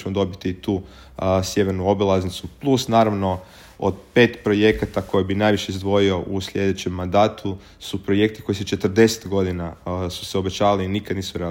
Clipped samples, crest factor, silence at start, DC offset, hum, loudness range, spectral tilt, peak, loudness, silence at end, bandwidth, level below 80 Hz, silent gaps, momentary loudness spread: under 0.1%; 20 dB; 0 s; under 0.1%; none; 2 LU; -5.5 dB/octave; -2 dBFS; -21 LUFS; 0 s; 16.5 kHz; -48 dBFS; none; 10 LU